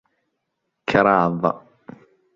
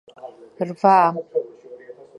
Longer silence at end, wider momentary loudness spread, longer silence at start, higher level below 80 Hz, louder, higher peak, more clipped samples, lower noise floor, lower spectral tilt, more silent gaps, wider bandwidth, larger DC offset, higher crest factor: first, 0.8 s vs 0.25 s; second, 15 LU vs 26 LU; first, 0.9 s vs 0.25 s; first, -56 dBFS vs -78 dBFS; about the same, -19 LUFS vs -19 LUFS; about the same, -2 dBFS vs -2 dBFS; neither; first, -77 dBFS vs -42 dBFS; about the same, -7.5 dB/octave vs -7.5 dB/octave; neither; second, 7.6 kHz vs 9.6 kHz; neither; about the same, 20 dB vs 20 dB